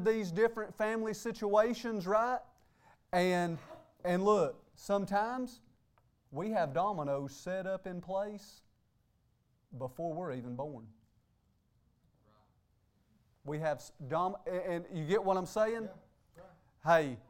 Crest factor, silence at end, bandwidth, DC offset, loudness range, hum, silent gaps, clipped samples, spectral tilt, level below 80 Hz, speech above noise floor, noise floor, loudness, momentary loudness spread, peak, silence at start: 22 dB; 0.1 s; 16.5 kHz; under 0.1%; 11 LU; none; none; under 0.1%; -6 dB/octave; -68 dBFS; 40 dB; -74 dBFS; -35 LUFS; 15 LU; -14 dBFS; 0 s